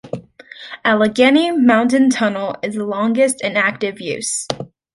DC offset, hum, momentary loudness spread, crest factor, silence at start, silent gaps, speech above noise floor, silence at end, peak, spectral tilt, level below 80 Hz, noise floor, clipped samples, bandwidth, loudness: under 0.1%; none; 14 LU; 16 dB; 0.05 s; none; 23 dB; 0.3 s; -2 dBFS; -4 dB/octave; -60 dBFS; -39 dBFS; under 0.1%; 11.5 kHz; -16 LUFS